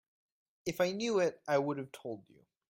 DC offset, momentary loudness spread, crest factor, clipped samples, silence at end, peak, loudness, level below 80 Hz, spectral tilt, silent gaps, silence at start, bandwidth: under 0.1%; 13 LU; 18 dB; under 0.1%; 0.5 s; -18 dBFS; -34 LUFS; -76 dBFS; -5 dB/octave; none; 0.65 s; 16 kHz